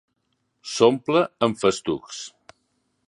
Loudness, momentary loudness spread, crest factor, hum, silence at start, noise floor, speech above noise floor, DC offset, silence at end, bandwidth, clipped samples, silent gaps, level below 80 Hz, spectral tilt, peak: -22 LUFS; 17 LU; 20 dB; none; 0.65 s; -73 dBFS; 51 dB; under 0.1%; 0.8 s; 11.5 kHz; under 0.1%; none; -62 dBFS; -4.5 dB/octave; -4 dBFS